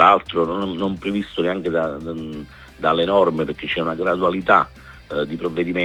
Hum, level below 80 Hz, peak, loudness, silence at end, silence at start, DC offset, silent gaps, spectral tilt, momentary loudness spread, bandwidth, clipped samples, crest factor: none; -48 dBFS; 0 dBFS; -21 LUFS; 0 s; 0 s; under 0.1%; none; -7 dB/octave; 13 LU; 18.5 kHz; under 0.1%; 20 dB